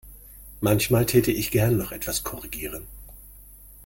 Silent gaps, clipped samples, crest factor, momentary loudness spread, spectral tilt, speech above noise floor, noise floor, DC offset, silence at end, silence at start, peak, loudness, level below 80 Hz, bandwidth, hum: none; under 0.1%; 20 dB; 24 LU; -5 dB/octave; 24 dB; -47 dBFS; under 0.1%; 0 s; 0.05 s; -6 dBFS; -24 LUFS; -44 dBFS; 17 kHz; none